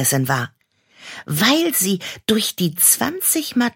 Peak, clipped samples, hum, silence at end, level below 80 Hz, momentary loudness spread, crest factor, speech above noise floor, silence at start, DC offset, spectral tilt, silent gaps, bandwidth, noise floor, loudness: -2 dBFS; under 0.1%; none; 0.05 s; -60 dBFS; 12 LU; 18 dB; 31 dB; 0 s; under 0.1%; -3 dB/octave; none; 17 kHz; -50 dBFS; -17 LUFS